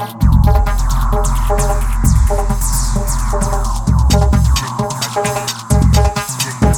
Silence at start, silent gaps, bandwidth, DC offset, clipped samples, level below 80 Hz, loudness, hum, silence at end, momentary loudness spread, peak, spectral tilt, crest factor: 0 s; none; 19 kHz; under 0.1%; under 0.1%; -14 dBFS; -15 LUFS; none; 0 s; 6 LU; 0 dBFS; -5 dB/octave; 12 dB